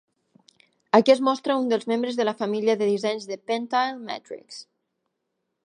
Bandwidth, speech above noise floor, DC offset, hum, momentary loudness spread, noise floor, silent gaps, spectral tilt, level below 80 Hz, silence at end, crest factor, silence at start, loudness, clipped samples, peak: 10 kHz; 56 dB; under 0.1%; none; 16 LU; -79 dBFS; none; -5 dB/octave; -82 dBFS; 1 s; 22 dB; 0.95 s; -23 LUFS; under 0.1%; -2 dBFS